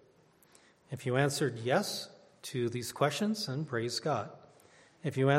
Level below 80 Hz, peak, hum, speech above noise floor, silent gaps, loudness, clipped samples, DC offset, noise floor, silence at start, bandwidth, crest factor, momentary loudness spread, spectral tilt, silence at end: -74 dBFS; -12 dBFS; none; 33 dB; none; -33 LUFS; under 0.1%; under 0.1%; -64 dBFS; 0.9 s; 16 kHz; 22 dB; 11 LU; -5 dB/octave; 0 s